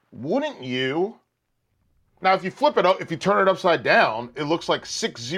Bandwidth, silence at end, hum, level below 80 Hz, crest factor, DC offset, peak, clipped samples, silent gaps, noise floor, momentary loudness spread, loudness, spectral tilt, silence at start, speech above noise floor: 12.5 kHz; 0 s; none; -66 dBFS; 16 dB; under 0.1%; -6 dBFS; under 0.1%; none; -73 dBFS; 9 LU; -22 LUFS; -4.5 dB/octave; 0.15 s; 52 dB